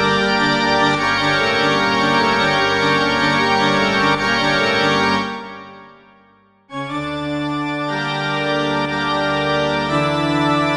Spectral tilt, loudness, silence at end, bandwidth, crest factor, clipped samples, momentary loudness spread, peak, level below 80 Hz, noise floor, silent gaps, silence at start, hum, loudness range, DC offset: -4.5 dB/octave; -17 LUFS; 0 s; 12 kHz; 14 dB; under 0.1%; 8 LU; -4 dBFS; -46 dBFS; -53 dBFS; none; 0 s; none; 8 LU; under 0.1%